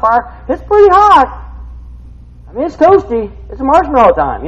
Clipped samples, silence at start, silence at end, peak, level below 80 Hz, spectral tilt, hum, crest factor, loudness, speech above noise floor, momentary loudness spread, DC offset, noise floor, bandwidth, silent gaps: 0.6%; 0 s; 0 s; 0 dBFS; -30 dBFS; -6.5 dB/octave; none; 10 dB; -10 LUFS; 24 dB; 18 LU; under 0.1%; -33 dBFS; 9.2 kHz; none